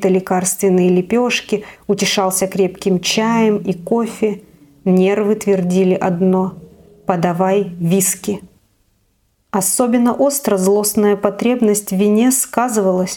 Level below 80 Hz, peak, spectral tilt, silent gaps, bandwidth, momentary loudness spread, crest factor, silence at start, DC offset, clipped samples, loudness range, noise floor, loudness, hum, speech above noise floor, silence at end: -54 dBFS; 0 dBFS; -4.5 dB/octave; none; 18 kHz; 7 LU; 16 dB; 0 s; under 0.1%; under 0.1%; 3 LU; -61 dBFS; -15 LUFS; none; 46 dB; 0 s